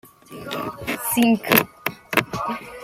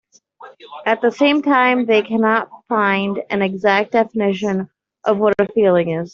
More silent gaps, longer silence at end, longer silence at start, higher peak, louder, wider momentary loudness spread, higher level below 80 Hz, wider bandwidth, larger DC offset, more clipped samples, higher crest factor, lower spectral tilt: neither; about the same, 0 s vs 0.05 s; second, 0.05 s vs 0.4 s; about the same, 0 dBFS vs -2 dBFS; second, -22 LUFS vs -17 LUFS; first, 13 LU vs 8 LU; first, -54 dBFS vs -60 dBFS; first, 16.5 kHz vs 7.4 kHz; neither; neither; first, 24 dB vs 14 dB; second, -3.5 dB/octave vs -6.5 dB/octave